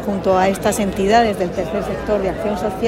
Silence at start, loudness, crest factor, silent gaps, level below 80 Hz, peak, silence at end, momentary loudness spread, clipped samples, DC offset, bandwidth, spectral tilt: 0 s; -18 LUFS; 16 dB; none; -36 dBFS; -2 dBFS; 0 s; 7 LU; under 0.1%; under 0.1%; 16.5 kHz; -5 dB/octave